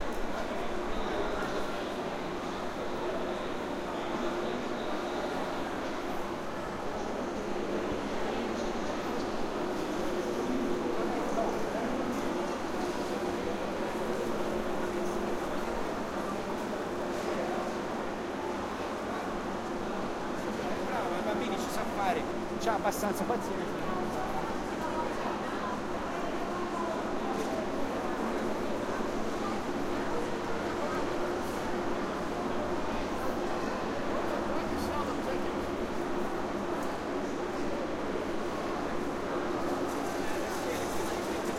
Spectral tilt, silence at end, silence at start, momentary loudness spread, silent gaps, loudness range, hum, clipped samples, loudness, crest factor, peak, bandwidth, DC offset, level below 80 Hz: -5 dB/octave; 0 s; 0 s; 3 LU; none; 2 LU; none; under 0.1%; -34 LUFS; 18 dB; -16 dBFS; 16.5 kHz; under 0.1%; -50 dBFS